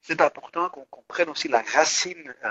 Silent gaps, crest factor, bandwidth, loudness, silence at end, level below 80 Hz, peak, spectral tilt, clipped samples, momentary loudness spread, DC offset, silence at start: none; 22 dB; 8.2 kHz; -24 LUFS; 0 s; -72 dBFS; -4 dBFS; -1 dB/octave; under 0.1%; 10 LU; under 0.1%; 0.05 s